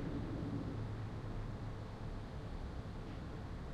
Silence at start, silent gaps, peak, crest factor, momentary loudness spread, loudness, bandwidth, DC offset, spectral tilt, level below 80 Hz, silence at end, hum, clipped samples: 0 s; none; -30 dBFS; 14 dB; 5 LU; -46 LUFS; 10 kHz; under 0.1%; -8 dB/octave; -50 dBFS; 0 s; none; under 0.1%